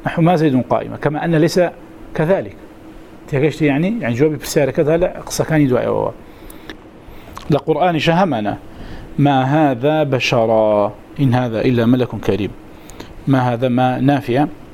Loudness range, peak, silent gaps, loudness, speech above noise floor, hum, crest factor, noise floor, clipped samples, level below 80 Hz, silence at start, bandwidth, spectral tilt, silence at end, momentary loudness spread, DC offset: 3 LU; 0 dBFS; none; -16 LUFS; 22 dB; none; 16 dB; -37 dBFS; under 0.1%; -40 dBFS; 0 s; 16.5 kHz; -6.5 dB/octave; 0 s; 13 LU; 0.3%